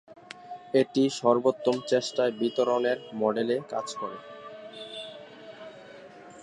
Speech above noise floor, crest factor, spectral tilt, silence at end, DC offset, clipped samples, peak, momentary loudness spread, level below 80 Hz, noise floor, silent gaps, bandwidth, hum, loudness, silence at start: 21 dB; 20 dB; -5 dB/octave; 0 s; under 0.1%; under 0.1%; -8 dBFS; 22 LU; -78 dBFS; -48 dBFS; none; 11 kHz; none; -27 LUFS; 0.1 s